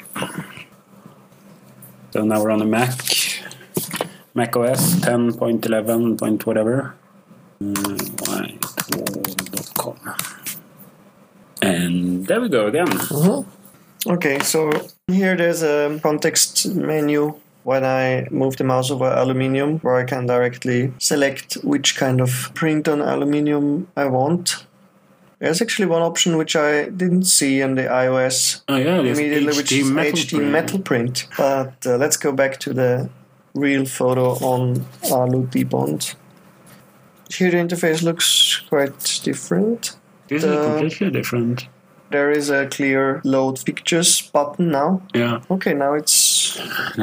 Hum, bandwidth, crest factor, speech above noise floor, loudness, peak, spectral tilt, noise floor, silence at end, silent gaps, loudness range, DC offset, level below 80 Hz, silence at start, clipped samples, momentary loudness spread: none; 16 kHz; 20 dB; 34 dB; -19 LUFS; 0 dBFS; -4 dB/octave; -53 dBFS; 0 s; none; 5 LU; under 0.1%; -66 dBFS; 0 s; under 0.1%; 9 LU